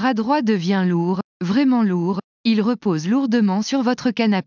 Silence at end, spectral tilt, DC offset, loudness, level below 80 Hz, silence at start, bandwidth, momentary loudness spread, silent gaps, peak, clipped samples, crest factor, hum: 0.05 s; -6.5 dB/octave; under 0.1%; -19 LUFS; -64 dBFS; 0 s; 7.2 kHz; 5 LU; 1.24-1.40 s, 2.24-2.44 s; -6 dBFS; under 0.1%; 12 dB; none